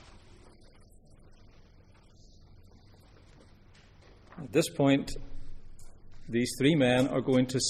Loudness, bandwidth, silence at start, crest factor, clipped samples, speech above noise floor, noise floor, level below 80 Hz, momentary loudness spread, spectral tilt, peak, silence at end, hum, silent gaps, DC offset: -28 LUFS; 15.5 kHz; 0.1 s; 22 dB; under 0.1%; 30 dB; -57 dBFS; -50 dBFS; 23 LU; -5 dB/octave; -10 dBFS; 0 s; none; none; under 0.1%